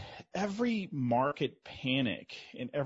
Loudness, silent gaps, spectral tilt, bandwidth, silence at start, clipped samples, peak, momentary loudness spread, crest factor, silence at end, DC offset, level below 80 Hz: -34 LUFS; none; -4.5 dB/octave; 7.6 kHz; 0 s; under 0.1%; -16 dBFS; 11 LU; 18 dB; 0 s; under 0.1%; -68 dBFS